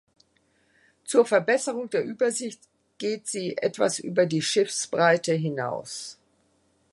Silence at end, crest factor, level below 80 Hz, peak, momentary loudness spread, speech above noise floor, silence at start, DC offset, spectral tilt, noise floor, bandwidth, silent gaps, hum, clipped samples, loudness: 0.8 s; 20 dB; -76 dBFS; -6 dBFS; 12 LU; 42 dB; 1.05 s; under 0.1%; -4 dB/octave; -67 dBFS; 11.5 kHz; none; none; under 0.1%; -25 LUFS